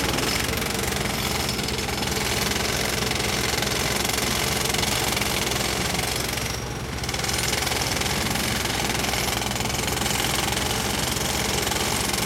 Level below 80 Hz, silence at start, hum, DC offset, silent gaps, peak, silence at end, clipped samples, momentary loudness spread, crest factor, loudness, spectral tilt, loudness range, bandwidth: -38 dBFS; 0 s; none; under 0.1%; none; -6 dBFS; 0 s; under 0.1%; 3 LU; 18 dB; -23 LUFS; -2.5 dB/octave; 1 LU; 17 kHz